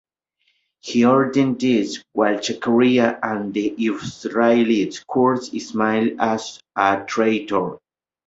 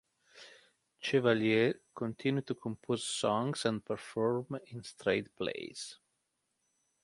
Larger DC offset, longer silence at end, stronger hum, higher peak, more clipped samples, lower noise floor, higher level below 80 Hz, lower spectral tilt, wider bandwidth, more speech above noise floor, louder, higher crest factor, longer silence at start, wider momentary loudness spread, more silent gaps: neither; second, 0.5 s vs 1.1 s; neither; first, -2 dBFS vs -14 dBFS; neither; second, -68 dBFS vs -82 dBFS; first, -60 dBFS vs -72 dBFS; about the same, -5.5 dB/octave vs -5 dB/octave; second, 8 kHz vs 11.5 kHz; about the same, 49 dB vs 48 dB; first, -20 LUFS vs -34 LUFS; about the same, 18 dB vs 22 dB; first, 0.85 s vs 0.35 s; second, 9 LU vs 14 LU; neither